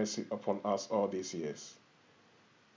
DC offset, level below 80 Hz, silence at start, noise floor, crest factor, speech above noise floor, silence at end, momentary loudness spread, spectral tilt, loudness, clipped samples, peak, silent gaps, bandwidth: under 0.1%; -80 dBFS; 0 s; -65 dBFS; 20 dB; 29 dB; 1 s; 11 LU; -4.5 dB/octave; -36 LUFS; under 0.1%; -18 dBFS; none; 7.6 kHz